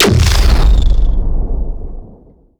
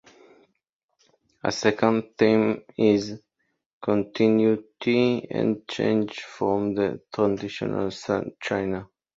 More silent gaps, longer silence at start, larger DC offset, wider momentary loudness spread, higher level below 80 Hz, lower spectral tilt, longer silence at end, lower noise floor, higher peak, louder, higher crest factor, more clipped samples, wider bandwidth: second, none vs 3.66-3.81 s; second, 0 s vs 1.45 s; neither; first, 19 LU vs 8 LU; first, -12 dBFS vs -60 dBFS; about the same, -5 dB/octave vs -6 dB/octave; first, 0.55 s vs 0.35 s; second, -41 dBFS vs -66 dBFS; first, 0 dBFS vs -4 dBFS; first, -14 LUFS vs -24 LUFS; second, 10 dB vs 20 dB; neither; first, 17 kHz vs 7.8 kHz